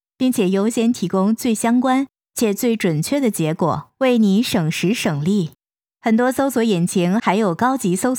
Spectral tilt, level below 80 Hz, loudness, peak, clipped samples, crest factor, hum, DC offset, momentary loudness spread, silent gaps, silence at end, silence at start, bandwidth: -5.5 dB/octave; -62 dBFS; -18 LUFS; -4 dBFS; under 0.1%; 14 dB; none; under 0.1%; 5 LU; none; 0 s; 0.2 s; over 20 kHz